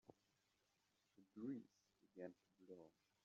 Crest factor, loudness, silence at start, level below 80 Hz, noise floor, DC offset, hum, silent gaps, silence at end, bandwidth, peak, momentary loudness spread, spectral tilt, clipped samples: 20 dB; -58 LUFS; 0.1 s; under -90 dBFS; -86 dBFS; under 0.1%; none; none; 0.35 s; 7.2 kHz; -40 dBFS; 13 LU; -7.5 dB/octave; under 0.1%